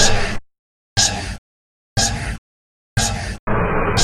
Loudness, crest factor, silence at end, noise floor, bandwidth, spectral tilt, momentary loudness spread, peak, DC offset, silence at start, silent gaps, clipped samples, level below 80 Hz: -20 LUFS; 20 dB; 0 s; under -90 dBFS; 14 kHz; -2.5 dB/octave; 14 LU; 0 dBFS; under 0.1%; 0 s; 0.59-0.96 s, 1.38-1.96 s, 2.38-2.96 s, 3.39-3.47 s; under 0.1%; -28 dBFS